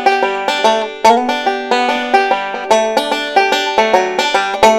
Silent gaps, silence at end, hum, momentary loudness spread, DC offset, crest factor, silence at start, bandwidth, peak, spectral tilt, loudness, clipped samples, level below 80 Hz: none; 0 s; none; 4 LU; under 0.1%; 14 dB; 0 s; 17 kHz; 0 dBFS; -2 dB/octave; -13 LUFS; under 0.1%; -52 dBFS